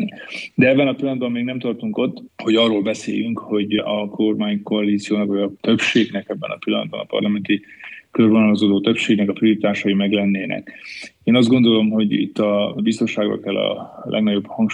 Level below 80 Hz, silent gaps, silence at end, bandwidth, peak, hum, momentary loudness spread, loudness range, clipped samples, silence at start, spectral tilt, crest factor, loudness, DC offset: -66 dBFS; none; 0 s; 9.8 kHz; -2 dBFS; none; 11 LU; 3 LU; under 0.1%; 0 s; -6 dB/octave; 16 dB; -19 LUFS; under 0.1%